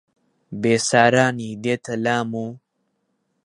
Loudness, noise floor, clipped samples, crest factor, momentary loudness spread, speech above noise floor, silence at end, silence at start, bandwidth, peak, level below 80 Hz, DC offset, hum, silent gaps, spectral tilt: -20 LUFS; -72 dBFS; under 0.1%; 22 dB; 14 LU; 52 dB; 0.9 s; 0.5 s; 11.5 kHz; 0 dBFS; -62 dBFS; under 0.1%; none; none; -4.5 dB/octave